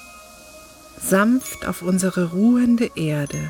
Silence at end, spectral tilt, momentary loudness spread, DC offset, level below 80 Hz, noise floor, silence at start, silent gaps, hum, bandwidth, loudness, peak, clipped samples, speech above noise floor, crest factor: 0 s; -5.5 dB/octave; 10 LU; under 0.1%; -50 dBFS; -44 dBFS; 0 s; none; none; 18 kHz; -20 LUFS; -4 dBFS; under 0.1%; 24 dB; 16 dB